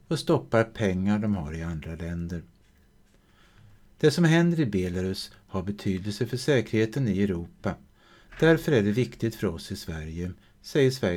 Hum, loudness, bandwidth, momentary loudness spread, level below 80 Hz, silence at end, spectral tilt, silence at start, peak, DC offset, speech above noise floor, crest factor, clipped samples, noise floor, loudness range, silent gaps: none; -27 LUFS; 16 kHz; 13 LU; -50 dBFS; 0 s; -6.5 dB/octave; 0.1 s; -8 dBFS; under 0.1%; 34 dB; 18 dB; under 0.1%; -59 dBFS; 4 LU; none